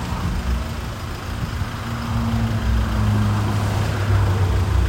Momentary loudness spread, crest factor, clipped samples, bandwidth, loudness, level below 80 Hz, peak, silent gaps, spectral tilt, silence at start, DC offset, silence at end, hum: 8 LU; 14 dB; under 0.1%; 16.5 kHz; -22 LUFS; -26 dBFS; -6 dBFS; none; -6.5 dB/octave; 0 s; under 0.1%; 0 s; none